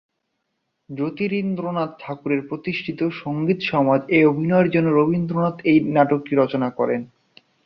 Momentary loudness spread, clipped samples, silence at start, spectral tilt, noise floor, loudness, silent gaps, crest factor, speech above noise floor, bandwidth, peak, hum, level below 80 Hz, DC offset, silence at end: 10 LU; under 0.1%; 0.9 s; -9.5 dB/octave; -75 dBFS; -21 LUFS; none; 18 dB; 55 dB; 6 kHz; -2 dBFS; none; -60 dBFS; under 0.1%; 0.6 s